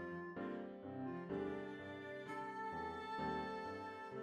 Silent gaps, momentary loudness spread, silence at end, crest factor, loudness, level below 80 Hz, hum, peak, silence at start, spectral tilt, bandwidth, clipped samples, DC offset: none; 6 LU; 0 s; 14 dB; -47 LUFS; -72 dBFS; none; -32 dBFS; 0 s; -7 dB/octave; 13 kHz; under 0.1%; under 0.1%